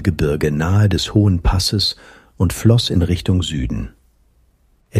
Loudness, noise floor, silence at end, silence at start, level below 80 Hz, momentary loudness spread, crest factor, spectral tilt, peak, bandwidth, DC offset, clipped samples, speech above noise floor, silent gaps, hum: -17 LUFS; -57 dBFS; 0 s; 0 s; -28 dBFS; 9 LU; 16 dB; -6 dB/octave; 0 dBFS; 15.5 kHz; under 0.1%; under 0.1%; 41 dB; none; none